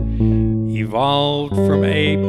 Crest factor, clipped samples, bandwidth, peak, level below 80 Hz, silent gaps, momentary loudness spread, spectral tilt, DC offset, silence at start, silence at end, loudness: 14 dB; under 0.1%; 11.5 kHz; -4 dBFS; -30 dBFS; none; 4 LU; -7.5 dB/octave; under 0.1%; 0 s; 0 s; -17 LUFS